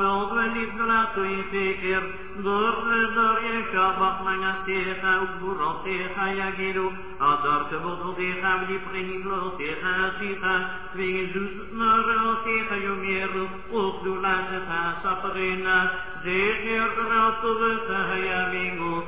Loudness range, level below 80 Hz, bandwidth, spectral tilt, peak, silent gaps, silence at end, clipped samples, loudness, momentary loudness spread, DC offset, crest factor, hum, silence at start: 3 LU; -50 dBFS; 4 kHz; -2 dB/octave; -10 dBFS; none; 0 s; under 0.1%; -25 LUFS; 8 LU; 1%; 16 dB; none; 0 s